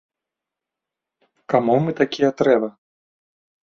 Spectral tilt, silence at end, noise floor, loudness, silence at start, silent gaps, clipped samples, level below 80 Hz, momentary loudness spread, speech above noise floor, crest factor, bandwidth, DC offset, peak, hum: -7 dB/octave; 0.9 s; -86 dBFS; -19 LUFS; 1.5 s; none; under 0.1%; -64 dBFS; 4 LU; 67 dB; 20 dB; 7.4 kHz; under 0.1%; -2 dBFS; none